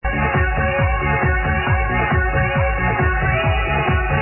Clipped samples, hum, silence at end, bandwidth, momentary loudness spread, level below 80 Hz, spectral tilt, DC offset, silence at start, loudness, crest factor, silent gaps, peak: under 0.1%; none; 0 s; 3.1 kHz; 1 LU; -24 dBFS; -10.5 dB/octave; under 0.1%; 0.05 s; -18 LUFS; 12 dB; none; -6 dBFS